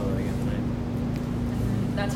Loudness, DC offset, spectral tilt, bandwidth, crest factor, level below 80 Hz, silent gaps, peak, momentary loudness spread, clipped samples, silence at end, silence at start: -28 LUFS; under 0.1%; -7.5 dB/octave; 16 kHz; 12 dB; -36 dBFS; none; -16 dBFS; 2 LU; under 0.1%; 0 s; 0 s